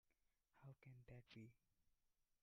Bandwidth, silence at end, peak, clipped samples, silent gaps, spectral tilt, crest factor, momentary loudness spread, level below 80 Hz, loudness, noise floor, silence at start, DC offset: 5.8 kHz; 0.05 s; -50 dBFS; under 0.1%; none; -6 dB/octave; 16 dB; 4 LU; -84 dBFS; -65 LUFS; -87 dBFS; 0.05 s; under 0.1%